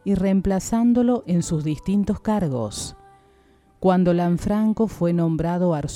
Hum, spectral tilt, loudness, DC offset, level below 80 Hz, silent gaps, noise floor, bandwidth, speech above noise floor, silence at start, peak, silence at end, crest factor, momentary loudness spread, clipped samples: none; -7 dB/octave; -21 LUFS; under 0.1%; -42 dBFS; none; -56 dBFS; 13.5 kHz; 36 dB; 0.05 s; -6 dBFS; 0 s; 16 dB; 6 LU; under 0.1%